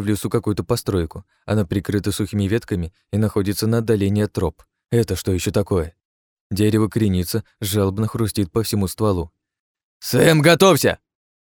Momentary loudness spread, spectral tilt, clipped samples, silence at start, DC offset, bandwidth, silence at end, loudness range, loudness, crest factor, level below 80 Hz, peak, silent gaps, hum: 11 LU; -5.5 dB/octave; under 0.1%; 0 s; under 0.1%; 19 kHz; 0.5 s; 4 LU; -20 LUFS; 20 dB; -42 dBFS; 0 dBFS; 6.05-6.50 s, 9.60-9.75 s, 9.83-10.00 s; none